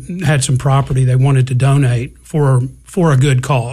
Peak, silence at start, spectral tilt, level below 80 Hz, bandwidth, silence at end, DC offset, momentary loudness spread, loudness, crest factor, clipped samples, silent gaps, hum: -2 dBFS; 0 s; -6.5 dB/octave; -38 dBFS; 12.5 kHz; 0 s; under 0.1%; 5 LU; -14 LUFS; 12 dB; under 0.1%; none; none